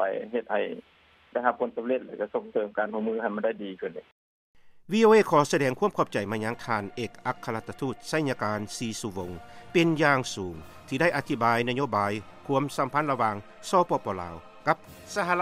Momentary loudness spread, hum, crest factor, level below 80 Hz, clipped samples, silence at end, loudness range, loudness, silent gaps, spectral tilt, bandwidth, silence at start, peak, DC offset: 13 LU; none; 20 dB; -62 dBFS; under 0.1%; 0 s; 6 LU; -28 LUFS; 4.12-4.54 s; -5.5 dB/octave; 15.5 kHz; 0 s; -6 dBFS; under 0.1%